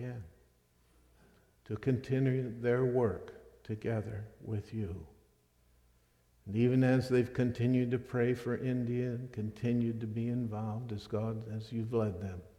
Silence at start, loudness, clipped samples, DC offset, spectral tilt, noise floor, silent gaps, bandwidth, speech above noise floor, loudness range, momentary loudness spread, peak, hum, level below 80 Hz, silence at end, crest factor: 0 s; -34 LUFS; under 0.1%; under 0.1%; -8.5 dB/octave; -69 dBFS; none; 11 kHz; 36 dB; 6 LU; 14 LU; -18 dBFS; 60 Hz at -55 dBFS; -62 dBFS; 0.1 s; 16 dB